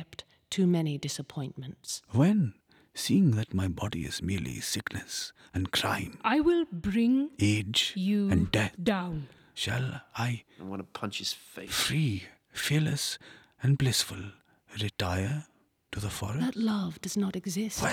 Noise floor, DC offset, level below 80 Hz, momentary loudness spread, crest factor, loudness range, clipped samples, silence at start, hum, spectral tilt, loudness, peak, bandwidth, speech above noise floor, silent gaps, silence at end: -49 dBFS; under 0.1%; -54 dBFS; 13 LU; 20 dB; 5 LU; under 0.1%; 0 s; none; -5 dB/octave; -30 LUFS; -10 dBFS; 19.5 kHz; 19 dB; none; 0 s